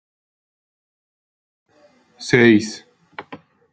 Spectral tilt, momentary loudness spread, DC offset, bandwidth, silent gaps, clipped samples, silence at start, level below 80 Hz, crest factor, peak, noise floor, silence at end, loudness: -5.5 dB/octave; 25 LU; under 0.1%; 9.2 kHz; none; under 0.1%; 2.2 s; -64 dBFS; 22 dB; 0 dBFS; -55 dBFS; 0.35 s; -15 LUFS